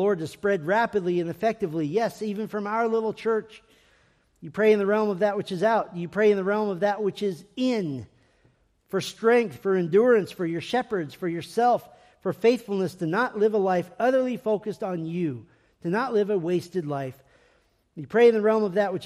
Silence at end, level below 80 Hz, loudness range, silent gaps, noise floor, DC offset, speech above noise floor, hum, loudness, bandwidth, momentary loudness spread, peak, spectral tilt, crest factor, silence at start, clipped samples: 0 s; -68 dBFS; 4 LU; none; -65 dBFS; under 0.1%; 40 dB; none; -25 LUFS; 14.5 kHz; 10 LU; -8 dBFS; -6.5 dB/octave; 18 dB; 0 s; under 0.1%